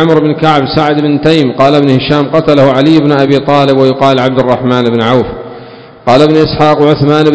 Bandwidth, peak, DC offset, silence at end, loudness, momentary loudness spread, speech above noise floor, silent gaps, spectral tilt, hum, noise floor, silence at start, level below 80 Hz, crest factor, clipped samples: 8 kHz; 0 dBFS; 0.6%; 0 s; -8 LUFS; 4 LU; 23 dB; none; -7.5 dB/octave; none; -30 dBFS; 0 s; -36 dBFS; 8 dB; 4%